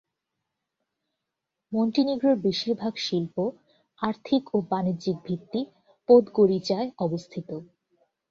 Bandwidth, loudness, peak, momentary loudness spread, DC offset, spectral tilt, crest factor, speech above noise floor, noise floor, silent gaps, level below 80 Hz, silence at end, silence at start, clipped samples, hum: 7.6 kHz; -25 LUFS; -6 dBFS; 15 LU; under 0.1%; -7 dB/octave; 20 dB; 60 dB; -85 dBFS; none; -68 dBFS; 0.65 s; 1.7 s; under 0.1%; none